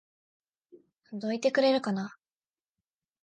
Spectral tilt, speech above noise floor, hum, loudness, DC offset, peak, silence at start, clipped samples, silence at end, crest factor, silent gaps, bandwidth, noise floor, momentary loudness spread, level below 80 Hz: -5.5 dB/octave; over 62 dB; none; -28 LUFS; under 0.1%; -14 dBFS; 0.75 s; under 0.1%; 1.1 s; 18 dB; none; 9.2 kHz; under -90 dBFS; 16 LU; -82 dBFS